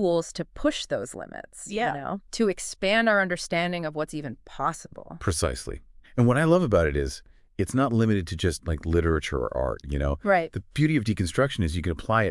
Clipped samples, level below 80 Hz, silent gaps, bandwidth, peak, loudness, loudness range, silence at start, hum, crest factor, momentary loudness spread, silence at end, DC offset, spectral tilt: under 0.1%; -40 dBFS; none; 12 kHz; -8 dBFS; -26 LUFS; 2 LU; 0 s; none; 18 dB; 14 LU; 0 s; under 0.1%; -5.5 dB/octave